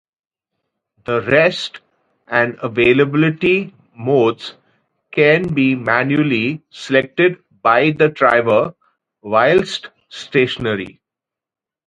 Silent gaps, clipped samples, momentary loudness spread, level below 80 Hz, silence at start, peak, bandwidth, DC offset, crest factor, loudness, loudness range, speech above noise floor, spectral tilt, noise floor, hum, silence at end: none; under 0.1%; 14 LU; -54 dBFS; 1.1 s; 0 dBFS; 9.4 kHz; under 0.1%; 18 dB; -16 LUFS; 2 LU; 70 dB; -6.5 dB/octave; -86 dBFS; none; 0.95 s